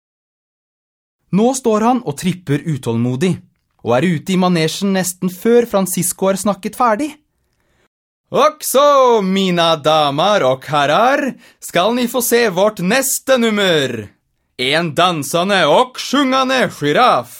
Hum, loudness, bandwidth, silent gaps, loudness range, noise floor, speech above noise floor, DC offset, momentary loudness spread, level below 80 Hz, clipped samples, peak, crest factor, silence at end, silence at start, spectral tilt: none; -15 LUFS; 18 kHz; 7.87-8.24 s; 4 LU; -63 dBFS; 49 dB; under 0.1%; 8 LU; -56 dBFS; under 0.1%; 0 dBFS; 16 dB; 0 s; 1.3 s; -4.5 dB/octave